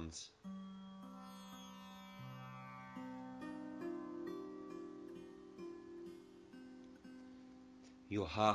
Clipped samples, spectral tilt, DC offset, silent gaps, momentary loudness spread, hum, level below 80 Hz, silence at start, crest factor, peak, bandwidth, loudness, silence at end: under 0.1%; -5.5 dB/octave; under 0.1%; none; 11 LU; none; -68 dBFS; 0 s; 28 dB; -18 dBFS; 14 kHz; -50 LUFS; 0 s